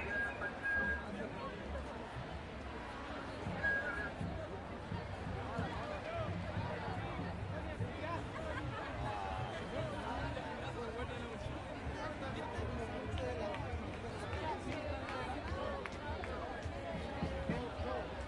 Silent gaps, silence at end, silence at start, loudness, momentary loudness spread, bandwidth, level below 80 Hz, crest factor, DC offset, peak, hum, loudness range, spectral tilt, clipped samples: none; 0 s; 0 s; -42 LUFS; 7 LU; 11.5 kHz; -52 dBFS; 16 dB; under 0.1%; -24 dBFS; none; 2 LU; -6 dB/octave; under 0.1%